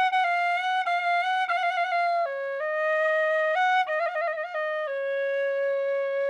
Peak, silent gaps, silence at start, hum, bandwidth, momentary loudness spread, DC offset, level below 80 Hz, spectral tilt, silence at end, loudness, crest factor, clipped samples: -14 dBFS; none; 0 s; none; 9.8 kHz; 6 LU; under 0.1%; -86 dBFS; 0.5 dB/octave; 0 s; -25 LUFS; 10 dB; under 0.1%